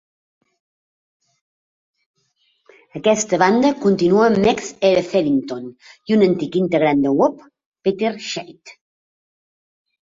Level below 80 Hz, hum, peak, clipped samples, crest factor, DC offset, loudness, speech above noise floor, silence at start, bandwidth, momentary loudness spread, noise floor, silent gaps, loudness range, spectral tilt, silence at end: -56 dBFS; none; -2 dBFS; under 0.1%; 18 dB; under 0.1%; -17 LUFS; 48 dB; 2.95 s; 7.8 kHz; 15 LU; -65 dBFS; 7.66-7.72 s; 6 LU; -5.5 dB/octave; 1.4 s